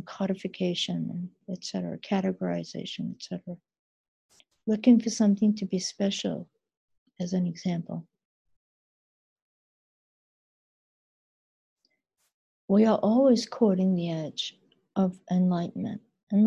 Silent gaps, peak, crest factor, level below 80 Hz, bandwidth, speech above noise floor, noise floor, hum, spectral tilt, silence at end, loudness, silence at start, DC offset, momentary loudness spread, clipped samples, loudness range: 3.79-4.29 s, 6.77-6.88 s, 6.98-7.06 s, 8.25-8.45 s, 8.56-9.36 s, 9.42-11.76 s, 12.34-12.68 s, 16.23-16.27 s; -8 dBFS; 20 dB; -70 dBFS; 9.6 kHz; 49 dB; -75 dBFS; none; -6.5 dB/octave; 0 s; -27 LUFS; 0 s; under 0.1%; 16 LU; under 0.1%; 10 LU